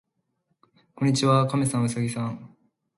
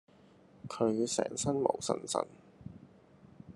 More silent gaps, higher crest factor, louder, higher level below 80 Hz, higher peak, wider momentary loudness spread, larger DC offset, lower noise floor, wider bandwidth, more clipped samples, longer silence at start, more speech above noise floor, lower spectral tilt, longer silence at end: neither; second, 18 dB vs 24 dB; first, -24 LUFS vs -33 LUFS; first, -62 dBFS vs -70 dBFS; first, -8 dBFS vs -12 dBFS; second, 12 LU vs 20 LU; neither; first, -75 dBFS vs -61 dBFS; about the same, 11.5 kHz vs 12.5 kHz; neither; first, 1 s vs 0.65 s; first, 51 dB vs 28 dB; first, -6 dB/octave vs -4.5 dB/octave; first, 0.5 s vs 0.05 s